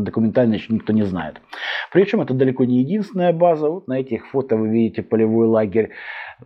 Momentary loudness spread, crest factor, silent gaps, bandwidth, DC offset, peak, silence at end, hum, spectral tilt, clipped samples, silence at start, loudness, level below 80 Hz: 9 LU; 16 dB; none; 6 kHz; under 0.1%; -2 dBFS; 0.1 s; none; -9 dB/octave; under 0.1%; 0 s; -19 LUFS; -58 dBFS